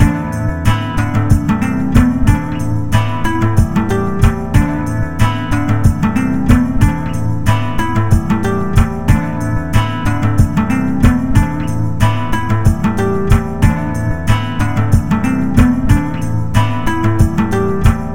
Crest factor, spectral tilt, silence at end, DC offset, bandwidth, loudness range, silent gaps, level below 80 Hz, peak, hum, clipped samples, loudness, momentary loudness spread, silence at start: 14 dB; -7 dB/octave; 0 s; 5%; 17 kHz; 1 LU; none; -20 dBFS; 0 dBFS; none; 0.2%; -15 LUFS; 5 LU; 0 s